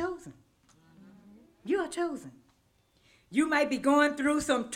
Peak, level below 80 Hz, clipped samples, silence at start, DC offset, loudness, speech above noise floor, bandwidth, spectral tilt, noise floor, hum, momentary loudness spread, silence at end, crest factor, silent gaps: -12 dBFS; -64 dBFS; under 0.1%; 0 s; under 0.1%; -28 LUFS; 41 dB; 15.5 kHz; -3.5 dB/octave; -69 dBFS; none; 16 LU; 0 s; 18 dB; none